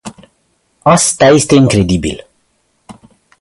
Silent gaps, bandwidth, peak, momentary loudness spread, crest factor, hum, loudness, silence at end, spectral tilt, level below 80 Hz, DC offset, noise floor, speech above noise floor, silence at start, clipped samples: none; 11.5 kHz; 0 dBFS; 16 LU; 12 dB; none; -10 LUFS; 0.5 s; -4.5 dB/octave; -36 dBFS; under 0.1%; -60 dBFS; 51 dB; 0.05 s; under 0.1%